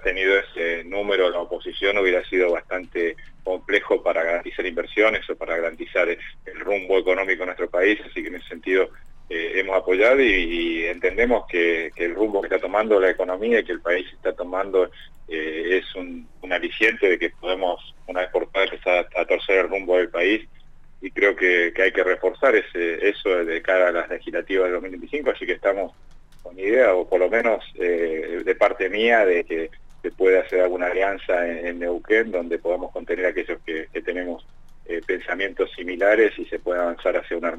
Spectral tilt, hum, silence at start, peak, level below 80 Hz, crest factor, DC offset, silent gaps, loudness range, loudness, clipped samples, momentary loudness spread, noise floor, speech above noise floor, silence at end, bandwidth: -4.5 dB/octave; none; 0 s; -6 dBFS; -44 dBFS; 16 dB; under 0.1%; none; 4 LU; -22 LUFS; under 0.1%; 11 LU; -44 dBFS; 23 dB; 0 s; 8 kHz